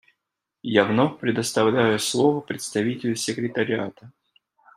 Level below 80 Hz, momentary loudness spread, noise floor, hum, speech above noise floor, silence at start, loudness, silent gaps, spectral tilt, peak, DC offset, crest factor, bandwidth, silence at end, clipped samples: -66 dBFS; 8 LU; -83 dBFS; none; 60 dB; 0.65 s; -23 LUFS; none; -4.5 dB/octave; -2 dBFS; under 0.1%; 22 dB; 15.5 kHz; 0.65 s; under 0.1%